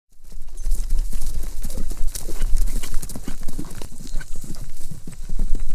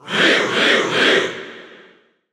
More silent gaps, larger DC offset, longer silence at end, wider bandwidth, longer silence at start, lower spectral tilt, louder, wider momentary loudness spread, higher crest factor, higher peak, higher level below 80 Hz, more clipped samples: neither; neither; second, 0 s vs 0.6 s; second, 12.5 kHz vs 15 kHz; about the same, 0.15 s vs 0.05 s; first, -4.5 dB/octave vs -2.5 dB/octave; second, -32 LUFS vs -15 LUFS; second, 10 LU vs 15 LU; about the same, 14 dB vs 16 dB; about the same, -2 dBFS vs -2 dBFS; first, -22 dBFS vs -66 dBFS; neither